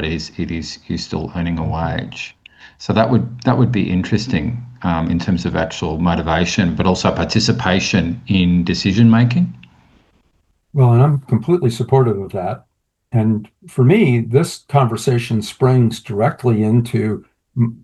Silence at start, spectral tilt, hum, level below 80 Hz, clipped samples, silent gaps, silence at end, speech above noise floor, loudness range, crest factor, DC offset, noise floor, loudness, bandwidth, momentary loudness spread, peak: 0 s; -6.5 dB/octave; none; -42 dBFS; under 0.1%; none; 0.1 s; 45 dB; 3 LU; 16 dB; under 0.1%; -61 dBFS; -17 LUFS; 12.5 kHz; 10 LU; 0 dBFS